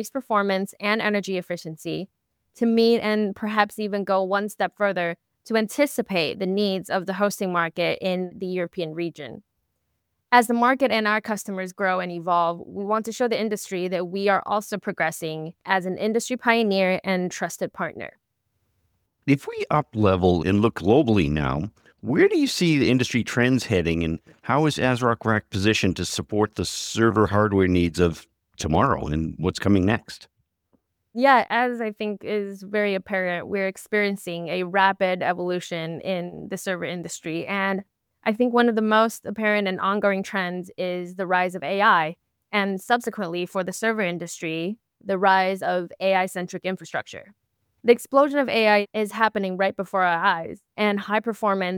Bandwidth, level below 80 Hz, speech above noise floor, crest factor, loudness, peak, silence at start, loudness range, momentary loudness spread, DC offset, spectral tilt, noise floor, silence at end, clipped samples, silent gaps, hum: 19.5 kHz; -50 dBFS; 53 dB; 20 dB; -23 LUFS; -2 dBFS; 0 s; 4 LU; 11 LU; under 0.1%; -5.5 dB/octave; -76 dBFS; 0 s; under 0.1%; none; none